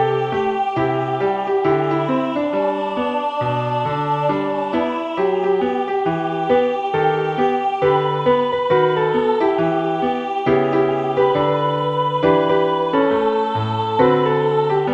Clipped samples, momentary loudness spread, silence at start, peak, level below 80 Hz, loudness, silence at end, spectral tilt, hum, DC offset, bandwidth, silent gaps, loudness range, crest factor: under 0.1%; 4 LU; 0 s; -2 dBFS; -54 dBFS; -18 LUFS; 0 s; -8 dB/octave; none; under 0.1%; 7.4 kHz; none; 3 LU; 16 dB